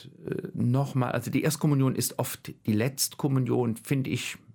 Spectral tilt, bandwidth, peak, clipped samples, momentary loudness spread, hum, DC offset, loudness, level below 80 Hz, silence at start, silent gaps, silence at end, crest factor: -5.5 dB/octave; 18 kHz; -12 dBFS; under 0.1%; 9 LU; none; under 0.1%; -28 LUFS; -64 dBFS; 0 s; none; 0.2 s; 16 dB